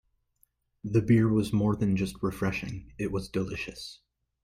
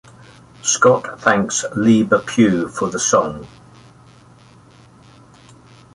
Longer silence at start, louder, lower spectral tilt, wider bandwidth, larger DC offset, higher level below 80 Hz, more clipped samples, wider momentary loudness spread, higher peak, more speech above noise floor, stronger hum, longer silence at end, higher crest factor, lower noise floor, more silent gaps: first, 0.85 s vs 0.65 s; second, -28 LUFS vs -16 LUFS; first, -7.5 dB/octave vs -4 dB/octave; first, 15 kHz vs 11.5 kHz; neither; about the same, -52 dBFS vs -52 dBFS; neither; first, 16 LU vs 9 LU; second, -12 dBFS vs -2 dBFS; first, 43 dB vs 30 dB; neither; second, 0.5 s vs 2.45 s; about the same, 18 dB vs 18 dB; first, -70 dBFS vs -46 dBFS; neither